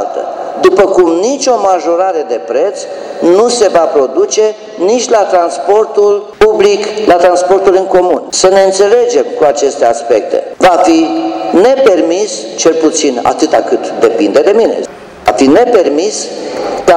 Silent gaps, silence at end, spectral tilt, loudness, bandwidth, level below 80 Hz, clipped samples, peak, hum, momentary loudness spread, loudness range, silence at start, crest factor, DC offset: none; 0 s; -3 dB/octave; -9 LUFS; 12.5 kHz; -44 dBFS; 1%; 0 dBFS; none; 8 LU; 2 LU; 0 s; 8 dB; under 0.1%